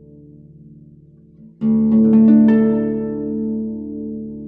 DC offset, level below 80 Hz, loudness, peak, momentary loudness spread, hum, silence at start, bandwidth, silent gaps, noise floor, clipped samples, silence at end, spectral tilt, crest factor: under 0.1%; -48 dBFS; -16 LUFS; -2 dBFS; 17 LU; none; 1.6 s; 2.8 kHz; none; -46 dBFS; under 0.1%; 0 s; -12 dB/octave; 14 dB